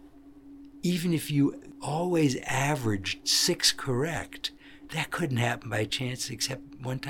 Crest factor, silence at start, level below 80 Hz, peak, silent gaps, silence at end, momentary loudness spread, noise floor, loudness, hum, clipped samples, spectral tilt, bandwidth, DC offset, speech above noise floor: 22 dB; 0.05 s; -56 dBFS; -8 dBFS; none; 0 s; 12 LU; -51 dBFS; -28 LUFS; none; under 0.1%; -4 dB/octave; 18 kHz; under 0.1%; 22 dB